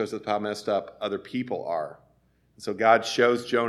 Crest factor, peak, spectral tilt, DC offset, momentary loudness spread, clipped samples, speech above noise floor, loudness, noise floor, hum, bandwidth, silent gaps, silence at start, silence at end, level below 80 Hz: 22 dB; -4 dBFS; -4.5 dB/octave; under 0.1%; 12 LU; under 0.1%; 39 dB; -26 LUFS; -65 dBFS; none; 13.5 kHz; none; 0 s; 0 s; -70 dBFS